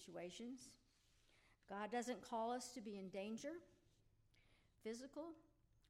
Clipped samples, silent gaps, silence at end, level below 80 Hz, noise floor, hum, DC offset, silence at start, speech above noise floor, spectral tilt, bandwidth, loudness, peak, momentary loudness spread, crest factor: under 0.1%; none; 0.45 s; -80 dBFS; -77 dBFS; none; under 0.1%; 0 s; 27 dB; -4 dB/octave; 16 kHz; -51 LUFS; -34 dBFS; 12 LU; 18 dB